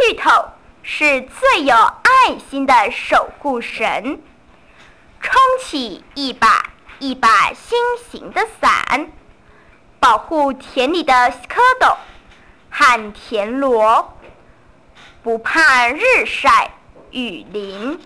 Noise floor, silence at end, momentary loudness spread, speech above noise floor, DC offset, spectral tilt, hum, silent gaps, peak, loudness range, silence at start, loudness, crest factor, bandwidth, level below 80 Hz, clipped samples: -48 dBFS; 0.1 s; 15 LU; 33 dB; 0.3%; -2.5 dB/octave; none; none; -2 dBFS; 4 LU; 0 s; -15 LUFS; 14 dB; 13 kHz; -46 dBFS; under 0.1%